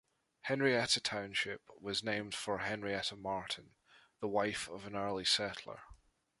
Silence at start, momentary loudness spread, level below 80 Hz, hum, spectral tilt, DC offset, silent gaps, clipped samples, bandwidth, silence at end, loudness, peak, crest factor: 0.45 s; 12 LU; -68 dBFS; none; -3 dB/octave; under 0.1%; none; under 0.1%; 11.5 kHz; 0.45 s; -36 LUFS; -18 dBFS; 20 dB